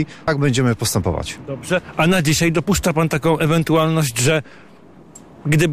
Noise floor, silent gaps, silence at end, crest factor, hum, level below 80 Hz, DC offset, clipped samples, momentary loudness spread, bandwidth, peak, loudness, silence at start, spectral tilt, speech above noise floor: -44 dBFS; none; 0 s; 12 dB; none; -40 dBFS; under 0.1%; under 0.1%; 6 LU; 15.5 kHz; -6 dBFS; -18 LUFS; 0 s; -5 dB/octave; 27 dB